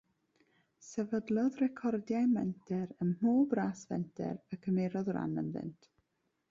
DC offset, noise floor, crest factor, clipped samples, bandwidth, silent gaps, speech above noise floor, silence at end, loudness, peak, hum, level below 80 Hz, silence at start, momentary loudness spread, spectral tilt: under 0.1%; -81 dBFS; 16 dB; under 0.1%; 7.6 kHz; none; 47 dB; 0.8 s; -35 LUFS; -18 dBFS; none; -72 dBFS; 0.8 s; 10 LU; -8 dB/octave